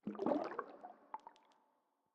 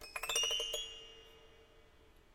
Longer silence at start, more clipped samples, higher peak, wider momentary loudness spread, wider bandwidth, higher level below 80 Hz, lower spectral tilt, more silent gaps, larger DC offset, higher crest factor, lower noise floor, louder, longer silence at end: about the same, 0.05 s vs 0 s; neither; about the same, -22 dBFS vs -20 dBFS; second, 18 LU vs 21 LU; second, 8 kHz vs 17 kHz; second, under -90 dBFS vs -62 dBFS; first, -8 dB/octave vs 1.5 dB/octave; neither; neither; about the same, 24 dB vs 22 dB; first, -81 dBFS vs -63 dBFS; second, -42 LUFS vs -36 LUFS; first, 0.85 s vs 0.15 s